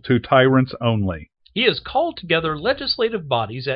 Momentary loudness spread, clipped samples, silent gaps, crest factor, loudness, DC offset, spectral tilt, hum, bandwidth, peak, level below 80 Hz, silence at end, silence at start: 8 LU; under 0.1%; none; 18 dB; -20 LUFS; under 0.1%; -11 dB/octave; none; 5.6 kHz; -2 dBFS; -48 dBFS; 0 s; 0.05 s